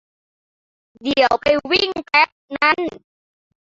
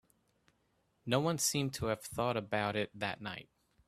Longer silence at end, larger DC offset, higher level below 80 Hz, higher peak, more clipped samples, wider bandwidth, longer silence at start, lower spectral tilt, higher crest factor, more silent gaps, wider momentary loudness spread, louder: first, 0.7 s vs 0.45 s; neither; first, -54 dBFS vs -66 dBFS; first, -2 dBFS vs -14 dBFS; neither; second, 7.8 kHz vs 15.5 kHz; about the same, 1.05 s vs 1.05 s; about the same, -4 dB/octave vs -4 dB/octave; about the same, 18 dB vs 22 dB; first, 2.32-2.48 s vs none; second, 6 LU vs 12 LU; first, -17 LUFS vs -35 LUFS